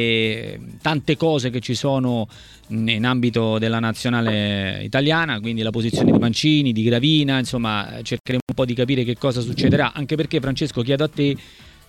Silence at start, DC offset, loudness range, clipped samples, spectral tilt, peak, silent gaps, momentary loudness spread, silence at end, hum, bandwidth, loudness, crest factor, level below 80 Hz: 0 s; under 0.1%; 3 LU; under 0.1%; -6 dB/octave; -2 dBFS; 8.20-8.24 s, 8.42-8.47 s; 7 LU; 0.2 s; none; 14 kHz; -20 LUFS; 18 dB; -48 dBFS